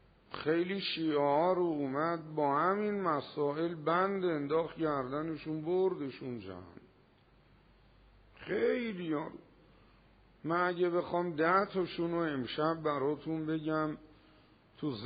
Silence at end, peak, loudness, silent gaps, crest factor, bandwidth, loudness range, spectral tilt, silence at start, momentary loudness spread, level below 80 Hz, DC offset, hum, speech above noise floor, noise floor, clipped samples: 0 s; -16 dBFS; -33 LUFS; none; 18 dB; 4.9 kHz; 7 LU; -4.5 dB/octave; 0.3 s; 10 LU; -68 dBFS; under 0.1%; none; 32 dB; -65 dBFS; under 0.1%